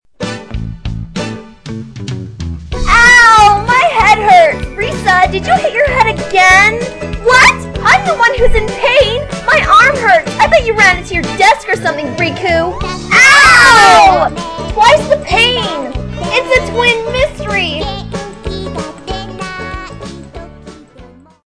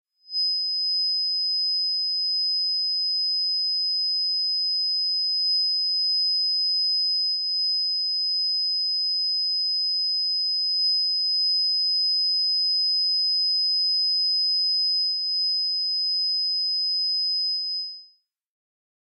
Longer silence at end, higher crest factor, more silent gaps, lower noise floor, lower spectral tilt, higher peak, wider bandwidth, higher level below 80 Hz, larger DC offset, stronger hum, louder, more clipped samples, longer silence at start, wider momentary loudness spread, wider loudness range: second, 0.4 s vs 1.1 s; about the same, 10 dB vs 6 dB; neither; second, -38 dBFS vs -59 dBFS; first, -3 dB/octave vs 9.5 dB/octave; first, 0 dBFS vs -18 dBFS; about the same, 11 kHz vs 10.5 kHz; first, -26 dBFS vs under -90 dBFS; first, 0.5% vs under 0.1%; neither; first, -8 LUFS vs -21 LUFS; neither; about the same, 0.2 s vs 0.3 s; first, 19 LU vs 2 LU; first, 10 LU vs 2 LU